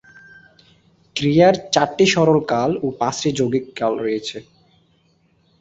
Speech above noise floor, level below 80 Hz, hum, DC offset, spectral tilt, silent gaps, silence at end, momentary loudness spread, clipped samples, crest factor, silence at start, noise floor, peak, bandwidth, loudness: 42 dB; -54 dBFS; none; under 0.1%; -5 dB/octave; none; 1.2 s; 11 LU; under 0.1%; 20 dB; 1.15 s; -60 dBFS; 0 dBFS; 8.2 kHz; -18 LUFS